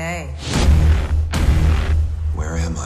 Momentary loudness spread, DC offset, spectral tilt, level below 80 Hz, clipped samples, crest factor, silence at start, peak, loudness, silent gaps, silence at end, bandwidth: 8 LU; under 0.1%; -6 dB/octave; -18 dBFS; under 0.1%; 10 dB; 0 s; -6 dBFS; -19 LUFS; none; 0 s; 12 kHz